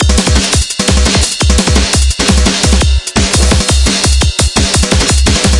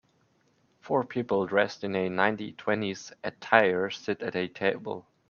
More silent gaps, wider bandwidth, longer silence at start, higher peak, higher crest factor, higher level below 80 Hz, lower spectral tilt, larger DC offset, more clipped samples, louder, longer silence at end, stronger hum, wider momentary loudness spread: neither; first, 11.5 kHz vs 7.2 kHz; second, 0 s vs 0.85 s; about the same, 0 dBFS vs -2 dBFS; second, 10 dB vs 26 dB; first, -12 dBFS vs -72 dBFS; second, -3.5 dB/octave vs -5.5 dB/octave; neither; neither; first, -9 LUFS vs -28 LUFS; second, 0 s vs 0.3 s; neither; second, 2 LU vs 13 LU